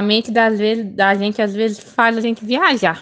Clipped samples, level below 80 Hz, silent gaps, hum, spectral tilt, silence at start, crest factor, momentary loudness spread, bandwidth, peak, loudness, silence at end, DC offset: under 0.1%; -62 dBFS; none; none; -5 dB/octave; 0 s; 16 dB; 5 LU; 9.2 kHz; 0 dBFS; -16 LUFS; 0 s; under 0.1%